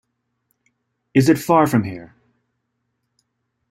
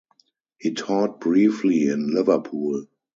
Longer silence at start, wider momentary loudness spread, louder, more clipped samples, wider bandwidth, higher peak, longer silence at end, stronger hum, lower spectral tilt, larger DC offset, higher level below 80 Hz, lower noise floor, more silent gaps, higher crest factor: first, 1.15 s vs 0.6 s; first, 15 LU vs 9 LU; first, -17 LUFS vs -22 LUFS; neither; first, 16 kHz vs 7.8 kHz; first, -2 dBFS vs -6 dBFS; first, 1.65 s vs 0.3 s; neither; about the same, -6.5 dB/octave vs -6.5 dB/octave; neither; first, -58 dBFS vs -68 dBFS; first, -74 dBFS vs -64 dBFS; neither; about the same, 20 dB vs 18 dB